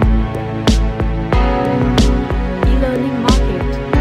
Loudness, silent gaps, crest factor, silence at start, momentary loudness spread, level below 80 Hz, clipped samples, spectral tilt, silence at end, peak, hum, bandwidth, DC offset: -16 LUFS; none; 14 dB; 0 s; 5 LU; -18 dBFS; under 0.1%; -6.5 dB/octave; 0 s; 0 dBFS; none; 11.5 kHz; under 0.1%